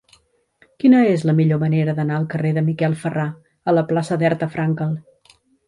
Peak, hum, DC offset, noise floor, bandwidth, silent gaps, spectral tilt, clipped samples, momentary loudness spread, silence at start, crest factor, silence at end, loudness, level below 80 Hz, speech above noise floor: -4 dBFS; none; under 0.1%; -58 dBFS; 11 kHz; none; -8.5 dB/octave; under 0.1%; 10 LU; 0.85 s; 16 dB; 0.65 s; -19 LUFS; -60 dBFS; 40 dB